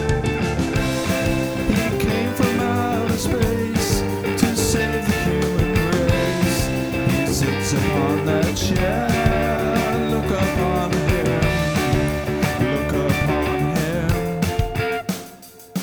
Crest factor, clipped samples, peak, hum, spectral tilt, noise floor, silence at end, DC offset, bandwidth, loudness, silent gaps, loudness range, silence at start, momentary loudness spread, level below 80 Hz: 18 dB; under 0.1%; -2 dBFS; none; -5.5 dB/octave; -41 dBFS; 0 s; 0.2%; over 20 kHz; -20 LUFS; none; 1 LU; 0 s; 3 LU; -32 dBFS